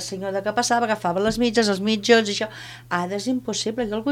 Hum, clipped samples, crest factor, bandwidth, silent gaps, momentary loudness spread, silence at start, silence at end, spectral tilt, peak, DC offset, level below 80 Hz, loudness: none; under 0.1%; 20 dB; 16 kHz; none; 9 LU; 0 s; 0 s; -3.5 dB/octave; -2 dBFS; under 0.1%; -52 dBFS; -22 LUFS